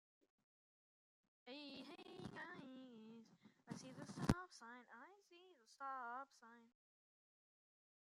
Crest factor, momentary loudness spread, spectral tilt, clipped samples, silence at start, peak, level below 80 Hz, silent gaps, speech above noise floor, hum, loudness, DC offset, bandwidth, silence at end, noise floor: 34 dB; 23 LU; -5.5 dB/octave; under 0.1%; 1.45 s; -20 dBFS; -66 dBFS; none; over 41 dB; none; -51 LUFS; under 0.1%; 13.5 kHz; 1.35 s; under -90 dBFS